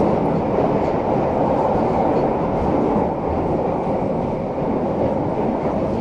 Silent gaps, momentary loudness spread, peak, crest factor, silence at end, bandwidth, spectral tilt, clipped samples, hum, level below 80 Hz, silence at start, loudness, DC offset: none; 3 LU; -6 dBFS; 14 dB; 0 s; 9.8 kHz; -9.5 dB/octave; under 0.1%; none; -38 dBFS; 0 s; -20 LUFS; under 0.1%